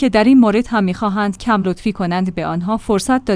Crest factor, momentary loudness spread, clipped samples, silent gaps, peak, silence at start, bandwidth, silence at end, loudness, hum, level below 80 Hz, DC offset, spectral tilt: 14 dB; 9 LU; under 0.1%; none; -2 dBFS; 0 s; 10.5 kHz; 0 s; -16 LUFS; none; -40 dBFS; under 0.1%; -6 dB/octave